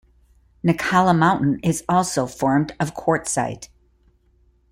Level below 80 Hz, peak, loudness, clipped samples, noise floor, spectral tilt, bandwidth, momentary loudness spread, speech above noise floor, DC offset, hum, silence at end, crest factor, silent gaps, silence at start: -50 dBFS; -4 dBFS; -20 LUFS; under 0.1%; -59 dBFS; -5.5 dB/octave; 15.5 kHz; 8 LU; 39 dB; under 0.1%; none; 1.05 s; 18 dB; none; 0.65 s